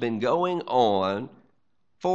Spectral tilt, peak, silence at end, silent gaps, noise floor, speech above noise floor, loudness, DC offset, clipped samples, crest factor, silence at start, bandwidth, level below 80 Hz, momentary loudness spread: -6.5 dB/octave; -8 dBFS; 0 s; none; -75 dBFS; 51 dB; -25 LUFS; 0.1%; under 0.1%; 18 dB; 0 s; 7.8 kHz; -70 dBFS; 10 LU